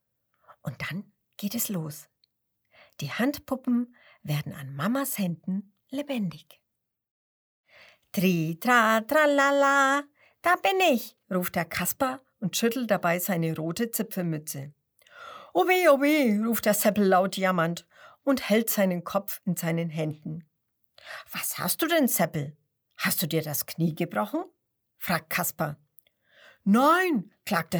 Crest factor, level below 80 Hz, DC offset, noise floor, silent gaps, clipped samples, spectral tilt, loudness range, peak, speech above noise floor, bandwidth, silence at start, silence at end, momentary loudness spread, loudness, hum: 20 dB; -68 dBFS; under 0.1%; -75 dBFS; 7.11-7.64 s; under 0.1%; -4.5 dB/octave; 9 LU; -6 dBFS; 49 dB; over 20 kHz; 0.5 s; 0 s; 16 LU; -26 LUFS; none